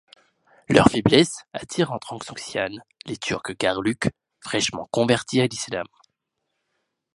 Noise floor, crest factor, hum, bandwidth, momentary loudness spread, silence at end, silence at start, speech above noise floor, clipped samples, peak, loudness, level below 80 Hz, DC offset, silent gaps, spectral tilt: -78 dBFS; 24 dB; none; 11.5 kHz; 16 LU; 1.3 s; 0.7 s; 56 dB; under 0.1%; 0 dBFS; -23 LUFS; -50 dBFS; under 0.1%; none; -4.5 dB/octave